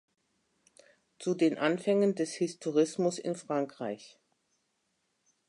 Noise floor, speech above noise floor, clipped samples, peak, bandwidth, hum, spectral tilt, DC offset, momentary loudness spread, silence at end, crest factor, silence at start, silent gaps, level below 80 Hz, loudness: -78 dBFS; 48 dB; under 0.1%; -12 dBFS; 11.5 kHz; none; -5.5 dB/octave; under 0.1%; 11 LU; 1.4 s; 20 dB; 1.2 s; none; -84 dBFS; -31 LUFS